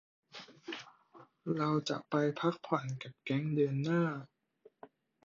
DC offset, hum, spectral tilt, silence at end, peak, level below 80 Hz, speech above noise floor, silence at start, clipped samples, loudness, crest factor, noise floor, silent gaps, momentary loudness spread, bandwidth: under 0.1%; none; -7 dB/octave; 0.45 s; -16 dBFS; -78 dBFS; 33 dB; 0.35 s; under 0.1%; -35 LUFS; 22 dB; -66 dBFS; none; 17 LU; 7.6 kHz